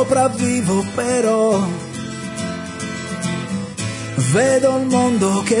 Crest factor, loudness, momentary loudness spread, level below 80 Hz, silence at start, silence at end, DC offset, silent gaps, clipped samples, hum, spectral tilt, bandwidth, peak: 14 dB; -19 LUFS; 11 LU; -54 dBFS; 0 s; 0 s; under 0.1%; none; under 0.1%; none; -5 dB/octave; 11 kHz; -4 dBFS